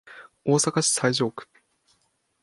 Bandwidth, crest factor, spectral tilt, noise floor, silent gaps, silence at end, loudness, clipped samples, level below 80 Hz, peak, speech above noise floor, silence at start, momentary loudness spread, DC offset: 11.5 kHz; 20 dB; -3.5 dB/octave; -70 dBFS; none; 1 s; -23 LUFS; under 0.1%; -68 dBFS; -6 dBFS; 47 dB; 0.05 s; 11 LU; under 0.1%